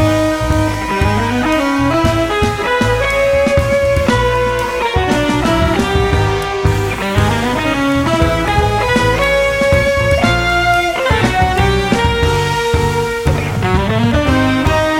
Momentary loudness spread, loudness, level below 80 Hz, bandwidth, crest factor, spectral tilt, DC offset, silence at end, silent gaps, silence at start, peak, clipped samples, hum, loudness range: 3 LU; -14 LUFS; -24 dBFS; 16.5 kHz; 12 dB; -5.5 dB/octave; under 0.1%; 0 s; none; 0 s; 0 dBFS; under 0.1%; none; 2 LU